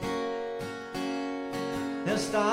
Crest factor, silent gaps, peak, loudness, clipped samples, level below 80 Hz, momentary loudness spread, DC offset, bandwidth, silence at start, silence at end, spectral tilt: 16 dB; none; -14 dBFS; -32 LUFS; under 0.1%; -58 dBFS; 7 LU; under 0.1%; 16 kHz; 0 s; 0 s; -4.5 dB/octave